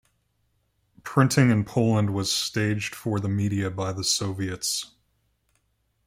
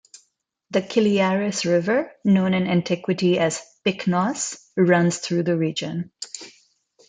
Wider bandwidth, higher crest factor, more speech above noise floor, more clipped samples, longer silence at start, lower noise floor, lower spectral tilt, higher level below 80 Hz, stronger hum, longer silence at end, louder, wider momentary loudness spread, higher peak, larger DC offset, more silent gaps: first, 16 kHz vs 9.4 kHz; about the same, 20 dB vs 18 dB; about the same, 48 dB vs 48 dB; neither; first, 1.05 s vs 0.7 s; about the same, -71 dBFS vs -69 dBFS; about the same, -4.5 dB/octave vs -5.5 dB/octave; first, -60 dBFS vs -66 dBFS; neither; first, 1.2 s vs 0.6 s; about the same, -24 LUFS vs -22 LUFS; about the same, 8 LU vs 9 LU; about the same, -6 dBFS vs -4 dBFS; neither; neither